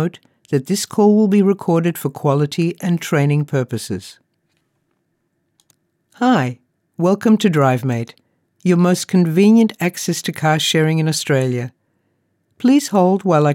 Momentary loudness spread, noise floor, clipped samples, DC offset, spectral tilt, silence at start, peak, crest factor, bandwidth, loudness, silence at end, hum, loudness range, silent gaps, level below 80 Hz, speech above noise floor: 10 LU; -69 dBFS; under 0.1%; under 0.1%; -6 dB/octave; 0 s; -2 dBFS; 14 dB; 16.5 kHz; -16 LUFS; 0 s; none; 8 LU; none; -78 dBFS; 53 dB